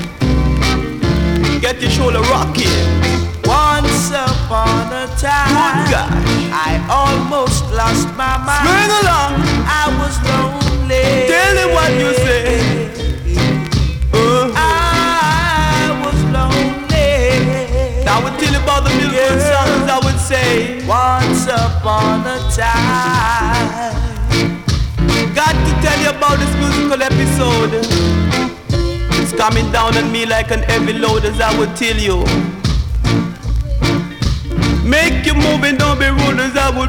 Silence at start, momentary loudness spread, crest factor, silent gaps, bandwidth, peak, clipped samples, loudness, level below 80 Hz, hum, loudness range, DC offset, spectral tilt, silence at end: 0 s; 5 LU; 14 dB; none; 19 kHz; 0 dBFS; under 0.1%; -14 LUFS; -22 dBFS; none; 2 LU; under 0.1%; -5 dB/octave; 0 s